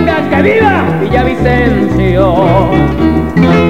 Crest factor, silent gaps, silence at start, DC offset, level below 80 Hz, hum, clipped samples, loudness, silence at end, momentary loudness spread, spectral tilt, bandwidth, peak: 8 dB; none; 0 s; 2%; -22 dBFS; none; 0.2%; -9 LUFS; 0 s; 3 LU; -8 dB/octave; 15 kHz; 0 dBFS